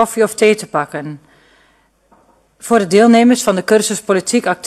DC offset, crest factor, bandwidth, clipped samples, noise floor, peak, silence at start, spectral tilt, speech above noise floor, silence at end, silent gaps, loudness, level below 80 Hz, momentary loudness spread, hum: under 0.1%; 14 dB; 13 kHz; under 0.1%; -55 dBFS; 0 dBFS; 0 s; -4 dB/octave; 42 dB; 0 s; none; -13 LUFS; -58 dBFS; 15 LU; none